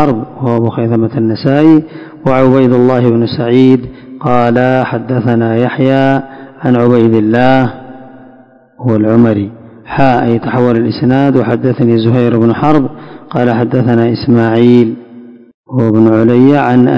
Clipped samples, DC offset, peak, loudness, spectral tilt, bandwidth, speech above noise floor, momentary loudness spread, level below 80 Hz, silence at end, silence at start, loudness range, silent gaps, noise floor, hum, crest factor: 3%; under 0.1%; 0 dBFS; -10 LUFS; -9.5 dB/octave; 6 kHz; 32 dB; 10 LU; -44 dBFS; 0 s; 0 s; 2 LU; 15.54-15.64 s; -41 dBFS; none; 10 dB